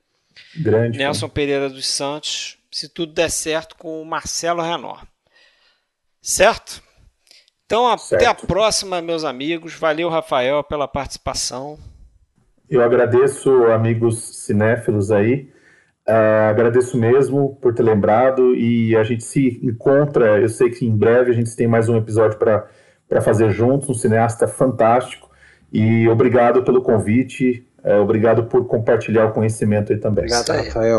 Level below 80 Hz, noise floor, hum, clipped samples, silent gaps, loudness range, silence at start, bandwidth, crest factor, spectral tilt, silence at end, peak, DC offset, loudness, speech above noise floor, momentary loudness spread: -46 dBFS; -68 dBFS; none; under 0.1%; none; 6 LU; 0.55 s; 12 kHz; 18 dB; -5.5 dB/octave; 0 s; 0 dBFS; under 0.1%; -17 LUFS; 52 dB; 10 LU